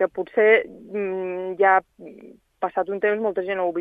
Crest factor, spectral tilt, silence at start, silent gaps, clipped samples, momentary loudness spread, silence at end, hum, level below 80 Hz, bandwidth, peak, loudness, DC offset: 18 dB; -7.5 dB/octave; 0 s; none; under 0.1%; 12 LU; 0 s; none; -66 dBFS; 3.8 kHz; -4 dBFS; -22 LUFS; under 0.1%